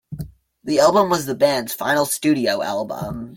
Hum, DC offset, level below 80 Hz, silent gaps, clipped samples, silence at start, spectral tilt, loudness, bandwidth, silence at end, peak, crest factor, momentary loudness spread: none; under 0.1%; -50 dBFS; none; under 0.1%; 0.1 s; -4 dB/octave; -19 LUFS; 17 kHz; 0 s; -2 dBFS; 18 dB; 19 LU